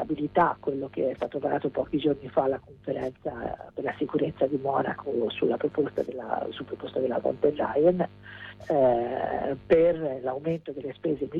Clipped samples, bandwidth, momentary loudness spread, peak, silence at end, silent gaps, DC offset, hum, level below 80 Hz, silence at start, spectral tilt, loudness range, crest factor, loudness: under 0.1%; 5.4 kHz; 11 LU; -10 dBFS; 0 s; none; under 0.1%; none; -58 dBFS; 0 s; -8.5 dB/octave; 4 LU; 18 dB; -28 LUFS